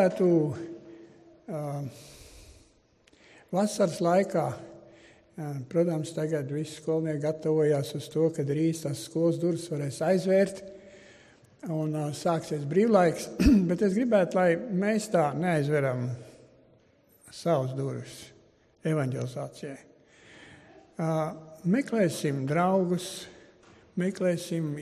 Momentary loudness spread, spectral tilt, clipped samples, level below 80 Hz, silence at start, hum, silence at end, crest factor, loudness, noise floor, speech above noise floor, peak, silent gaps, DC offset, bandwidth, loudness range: 18 LU; -6.5 dB/octave; under 0.1%; -48 dBFS; 0 s; none; 0 s; 20 dB; -28 LUFS; -63 dBFS; 36 dB; -8 dBFS; none; under 0.1%; 14.5 kHz; 9 LU